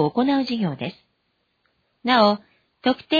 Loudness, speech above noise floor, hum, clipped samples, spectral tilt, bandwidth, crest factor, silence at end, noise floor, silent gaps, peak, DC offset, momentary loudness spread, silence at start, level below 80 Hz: -22 LUFS; 51 dB; none; under 0.1%; -7 dB/octave; 5 kHz; 18 dB; 0 s; -71 dBFS; none; -4 dBFS; under 0.1%; 13 LU; 0 s; -64 dBFS